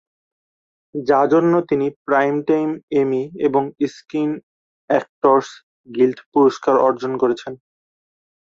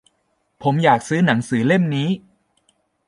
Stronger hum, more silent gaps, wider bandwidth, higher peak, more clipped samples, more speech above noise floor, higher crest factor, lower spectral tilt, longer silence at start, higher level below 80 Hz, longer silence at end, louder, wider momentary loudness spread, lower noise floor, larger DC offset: neither; first, 1.96-2.05 s, 2.83-2.88 s, 4.43-4.88 s, 5.09-5.21 s, 5.63-5.84 s, 6.26-6.32 s vs none; second, 7.6 kHz vs 11.5 kHz; about the same, -2 dBFS vs -2 dBFS; neither; first, over 72 dB vs 50 dB; about the same, 18 dB vs 18 dB; about the same, -7 dB/octave vs -6.5 dB/octave; first, 0.95 s vs 0.6 s; about the same, -64 dBFS vs -60 dBFS; about the same, 0.9 s vs 0.9 s; about the same, -18 LUFS vs -19 LUFS; about the same, 10 LU vs 8 LU; first, under -90 dBFS vs -68 dBFS; neither